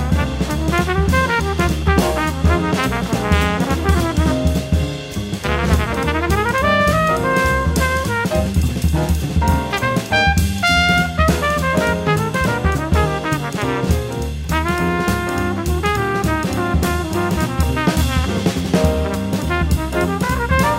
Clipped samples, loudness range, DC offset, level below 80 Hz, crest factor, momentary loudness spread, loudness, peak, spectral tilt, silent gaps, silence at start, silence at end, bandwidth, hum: under 0.1%; 3 LU; under 0.1%; -24 dBFS; 16 dB; 5 LU; -18 LUFS; -2 dBFS; -5.5 dB/octave; none; 0 s; 0 s; 16.5 kHz; none